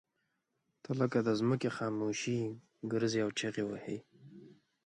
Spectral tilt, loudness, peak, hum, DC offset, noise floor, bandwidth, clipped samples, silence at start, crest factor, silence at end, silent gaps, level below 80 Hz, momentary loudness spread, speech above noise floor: -5.5 dB/octave; -35 LUFS; -18 dBFS; none; under 0.1%; -82 dBFS; 10.5 kHz; under 0.1%; 0.9 s; 18 dB; 0.35 s; none; -76 dBFS; 11 LU; 48 dB